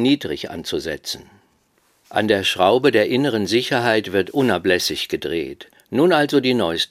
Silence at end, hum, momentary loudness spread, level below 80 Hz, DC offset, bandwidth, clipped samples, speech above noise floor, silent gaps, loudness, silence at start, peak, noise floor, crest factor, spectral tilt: 0.05 s; none; 11 LU; -56 dBFS; under 0.1%; 16 kHz; under 0.1%; 43 dB; none; -19 LUFS; 0 s; 0 dBFS; -62 dBFS; 18 dB; -4.5 dB/octave